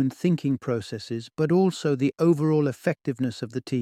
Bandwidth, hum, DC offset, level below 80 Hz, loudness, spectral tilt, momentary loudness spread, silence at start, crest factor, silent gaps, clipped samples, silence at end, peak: 14 kHz; none; under 0.1%; -66 dBFS; -25 LUFS; -7.5 dB/octave; 10 LU; 0 s; 16 dB; none; under 0.1%; 0 s; -10 dBFS